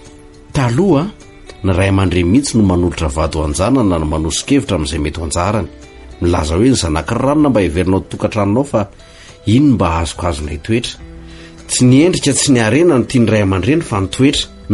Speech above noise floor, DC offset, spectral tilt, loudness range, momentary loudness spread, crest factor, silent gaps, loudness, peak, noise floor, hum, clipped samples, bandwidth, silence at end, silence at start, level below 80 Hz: 25 dB; under 0.1%; -5.5 dB/octave; 3 LU; 9 LU; 12 dB; none; -14 LUFS; -2 dBFS; -38 dBFS; none; under 0.1%; 11.5 kHz; 0 s; 0 s; -30 dBFS